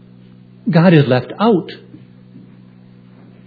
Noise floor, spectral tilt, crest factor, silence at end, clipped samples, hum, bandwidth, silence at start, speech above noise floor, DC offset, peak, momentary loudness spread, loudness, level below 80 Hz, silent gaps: -42 dBFS; -10 dB/octave; 18 dB; 1.7 s; under 0.1%; none; 4.9 kHz; 0.65 s; 30 dB; under 0.1%; 0 dBFS; 19 LU; -14 LUFS; -62 dBFS; none